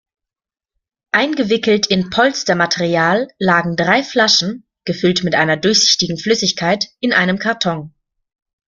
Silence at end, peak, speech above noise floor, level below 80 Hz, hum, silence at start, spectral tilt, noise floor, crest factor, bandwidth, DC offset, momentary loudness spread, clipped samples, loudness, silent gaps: 0.8 s; 0 dBFS; 74 dB; -54 dBFS; none; 1.15 s; -3.5 dB/octave; -89 dBFS; 16 dB; 7.6 kHz; under 0.1%; 6 LU; under 0.1%; -15 LUFS; none